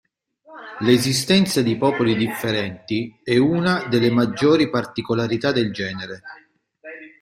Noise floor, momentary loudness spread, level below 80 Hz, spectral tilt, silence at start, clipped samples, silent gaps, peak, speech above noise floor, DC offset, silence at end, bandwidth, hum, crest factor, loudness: -42 dBFS; 16 LU; -56 dBFS; -5 dB/octave; 0.5 s; under 0.1%; none; -2 dBFS; 23 dB; under 0.1%; 0.15 s; 16 kHz; none; 18 dB; -20 LUFS